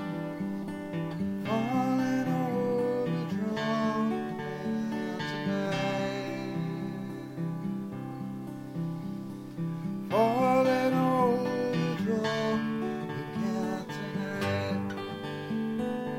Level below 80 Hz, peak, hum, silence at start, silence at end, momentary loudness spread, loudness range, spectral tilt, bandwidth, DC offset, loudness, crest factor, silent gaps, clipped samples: -66 dBFS; -14 dBFS; none; 0 s; 0 s; 11 LU; 8 LU; -7 dB/octave; 16.5 kHz; under 0.1%; -31 LUFS; 16 dB; none; under 0.1%